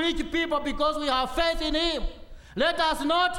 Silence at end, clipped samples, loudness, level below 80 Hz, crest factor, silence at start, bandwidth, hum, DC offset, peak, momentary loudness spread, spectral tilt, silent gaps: 0 s; under 0.1%; -26 LUFS; -38 dBFS; 16 dB; 0 s; 16.5 kHz; none; under 0.1%; -10 dBFS; 5 LU; -3.5 dB/octave; none